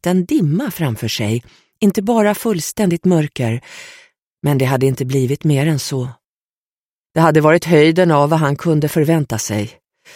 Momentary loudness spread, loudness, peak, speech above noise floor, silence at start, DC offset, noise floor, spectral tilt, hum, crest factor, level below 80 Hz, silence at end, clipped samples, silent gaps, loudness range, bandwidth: 11 LU; -16 LUFS; 0 dBFS; over 75 dB; 0.05 s; under 0.1%; under -90 dBFS; -6 dB/octave; none; 16 dB; -52 dBFS; 0.45 s; under 0.1%; 4.27-4.37 s, 6.26-7.10 s; 5 LU; 16.5 kHz